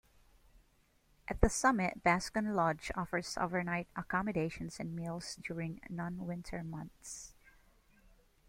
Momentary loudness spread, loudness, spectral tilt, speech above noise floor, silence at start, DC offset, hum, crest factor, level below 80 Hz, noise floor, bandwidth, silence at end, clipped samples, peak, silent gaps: 15 LU; -36 LUFS; -5 dB/octave; 35 dB; 1.3 s; under 0.1%; none; 30 dB; -50 dBFS; -71 dBFS; 16.5 kHz; 1.15 s; under 0.1%; -8 dBFS; none